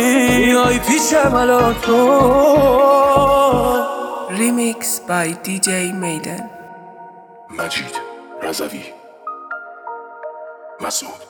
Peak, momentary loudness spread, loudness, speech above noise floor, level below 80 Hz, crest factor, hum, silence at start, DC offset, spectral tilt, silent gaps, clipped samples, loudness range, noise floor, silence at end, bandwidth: 0 dBFS; 21 LU; -15 LUFS; 24 dB; -40 dBFS; 16 dB; none; 0 s; under 0.1%; -4 dB/octave; none; under 0.1%; 15 LU; -39 dBFS; 0.05 s; over 20 kHz